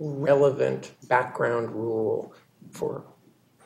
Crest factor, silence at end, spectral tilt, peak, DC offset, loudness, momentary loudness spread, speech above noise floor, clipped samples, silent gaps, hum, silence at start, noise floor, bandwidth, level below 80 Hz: 20 dB; 0.65 s; -7 dB/octave; -6 dBFS; under 0.1%; -26 LUFS; 16 LU; 34 dB; under 0.1%; none; none; 0 s; -59 dBFS; 15 kHz; -70 dBFS